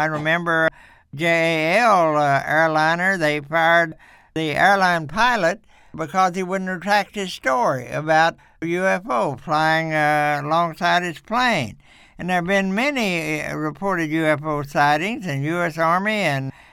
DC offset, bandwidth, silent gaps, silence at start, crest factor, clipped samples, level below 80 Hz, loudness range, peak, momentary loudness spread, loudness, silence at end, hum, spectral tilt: under 0.1%; 16.5 kHz; none; 0 s; 18 dB; under 0.1%; -52 dBFS; 4 LU; -2 dBFS; 8 LU; -20 LUFS; 0.25 s; none; -5 dB/octave